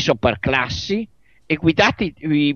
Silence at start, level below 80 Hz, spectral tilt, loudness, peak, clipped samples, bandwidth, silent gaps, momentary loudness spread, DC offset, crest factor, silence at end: 0 s; -42 dBFS; -5.5 dB/octave; -19 LUFS; -2 dBFS; under 0.1%; 7 kHz; none; 9 LU; 0.2%; 18 dB; 0 s